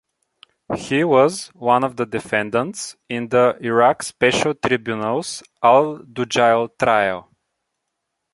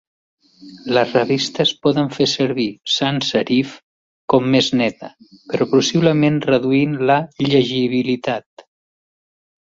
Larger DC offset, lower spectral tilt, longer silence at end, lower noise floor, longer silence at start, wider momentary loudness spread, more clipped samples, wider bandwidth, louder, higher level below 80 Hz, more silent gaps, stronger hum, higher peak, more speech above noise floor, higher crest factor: neither; about the same, -4.5 dB/octave vs -5 dB/octave; second, 1.15 s vs 1.3 s; second, -77 dBFS vs under -90 dBFS; about the same, 0.7 s vs 0.6 s; first, 12 LU vs 8 LU; neither; first, 11.5 kHz vs 7.8 kHz; about the same, -19 LUFS vs -17 LUFS; about the same, -56 dBFS vs -58 dBFS; second, none vs 3.83-4.28 s; neither; about the same, -2 dBFS vs -2 dBFS; second, 59 dB vs over 73 dB; about the same, 18 dB vs 18 dB